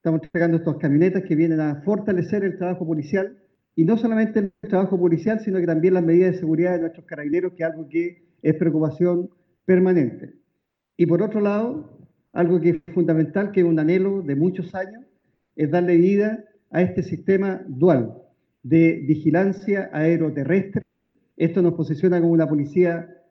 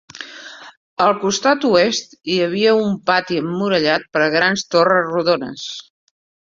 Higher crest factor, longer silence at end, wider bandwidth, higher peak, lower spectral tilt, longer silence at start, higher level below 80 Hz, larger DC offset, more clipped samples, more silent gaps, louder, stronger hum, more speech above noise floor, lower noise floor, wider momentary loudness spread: about the same, 16 dB vs 16 dB; second, 0.25 s vs 0.65 s; second, 6 kHz vs 7.6 kHz; second, -6 dBFS vs -2 dBFS; first, -10 dB/octave vs -4 dB/octave; about the same, 0.05 s vs 0.15 s; about the same, -64 dBFS vs -60 dBFS; neither; neither; second, none vs 0.77-0.97 s; second, -21 LUFS vs -17 LUFS; neither; first, 56 dB vs 20 dB; first, -76 dBFS vs -37 dBFS; second, 10 LU vs 18 LU